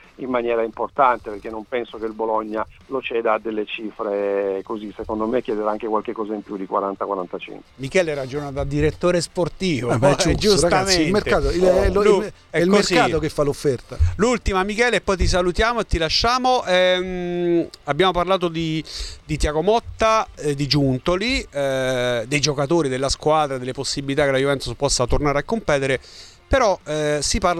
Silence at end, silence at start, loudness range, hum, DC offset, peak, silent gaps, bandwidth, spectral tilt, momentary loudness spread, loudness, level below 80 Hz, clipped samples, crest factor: 0 s; 0.2 s; 7 LU; none; under 0.1%; -2 dBFS; none; 13.5 kHz; -4.5 dB/octave; 10 LU; -20 LUFS; -34 dBFS; under 0.1%; 18 dB